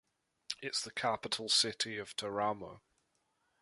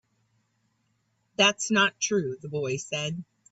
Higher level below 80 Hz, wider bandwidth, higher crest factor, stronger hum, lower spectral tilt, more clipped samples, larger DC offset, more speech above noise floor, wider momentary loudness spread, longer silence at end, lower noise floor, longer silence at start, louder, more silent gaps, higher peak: about the same, -74 dBFS vs -70 dBFS; first, 12 kHz vs 8.2 kHz; about the same, 24 dB vs 20 dB; neither; second, -1.5 dB/octave vs -3 dB/octave; neither; neither; about the same, 43 dB vs 46 dB; first, 14 LU vs 11 LU; first, 0.85 s vs 0.3 s; first, -79 dBFS vs -73 dBFS; second, 0.5 s vs 1.4 s; second, -35 LUFS vs -26 LUFS; neither; second, -16 dBFS vs -8 dBFS